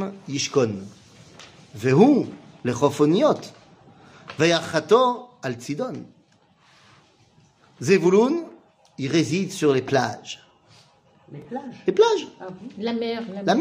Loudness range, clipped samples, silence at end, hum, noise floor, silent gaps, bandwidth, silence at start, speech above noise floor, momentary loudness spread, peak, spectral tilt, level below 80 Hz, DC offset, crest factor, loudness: 5 LU; under 0.1%; 0 s; none; -59 dBFS; none; 15.5 kHz; 0 s; 37 dB; 20 LU; -4 dBFS; -5.5 dB/octave; -66 dBFS; under 0.1%; 20 dB; -22 LUFS